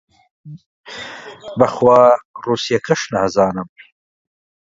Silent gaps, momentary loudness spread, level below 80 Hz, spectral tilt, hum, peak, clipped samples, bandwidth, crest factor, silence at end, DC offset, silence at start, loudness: 0.66-0.84 s, 2.25-2.34 s; 21 LU; -54 dBFS; -5 dB/octave; none; 0 dBFS; under 0.1%; 7.8 kHz; 18 dB; 1 s; under 0.1%; 0.45 s; -15 LUFS